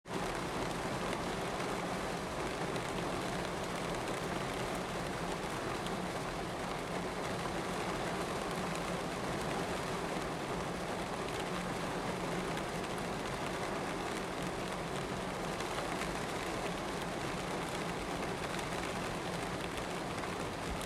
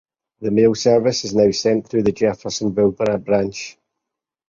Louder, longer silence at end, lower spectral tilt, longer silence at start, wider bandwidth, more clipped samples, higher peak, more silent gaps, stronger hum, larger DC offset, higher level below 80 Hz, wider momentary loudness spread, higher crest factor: second, -38 LUFS vs -18 LUFS; second, 0 s vs 0.8 s; about the same, -4.5 dB/octave vs -5 dB/octave; second, 0.05 s vs 0.4 s; first, 16 kHz vs 7.6 kHz; neither; second, -20 dBFS vs -2 dBFS; neither; neither; neither; about the same, -54 dBFS vs -52 dBFS; second, 2 LU vs 9 LU; about the same, 18 dB vs 16 dB